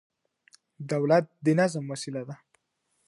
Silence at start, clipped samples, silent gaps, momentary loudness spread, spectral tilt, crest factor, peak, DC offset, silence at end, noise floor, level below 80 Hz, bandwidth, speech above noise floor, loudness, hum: 0.8 s; under 0.1%; none; 19 LU; -6.5 dB/octave; 22 dB; -8 dBFS; under 0.1%; 0.75 s; -76 dBFS; -76 dBFS; 11.5 kHz; 49 dB; -27 LUFS; none